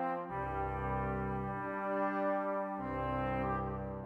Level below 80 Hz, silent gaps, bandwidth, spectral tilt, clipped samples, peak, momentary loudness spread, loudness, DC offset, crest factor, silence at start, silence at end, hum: -50 dBFS; none; 5.6 kHz; -9.5 dB/octave; under 0.1%; -24 dBFS; 4 LU; -37 LUFS; under 0.1%; 14 dB; 0 s; 0 s; none